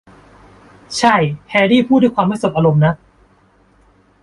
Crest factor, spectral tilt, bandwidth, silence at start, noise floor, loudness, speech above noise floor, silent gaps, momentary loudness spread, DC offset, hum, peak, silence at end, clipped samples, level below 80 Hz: 16 dB; -6 dB/octave; 11.5 kHz; 0.9 s; -53 dBFS; -14 LUFS; 39 dB; none; 5 LU; under 0.1%; none; 0 dBFS; 1.3 s; under 0.1%; -50 dBFS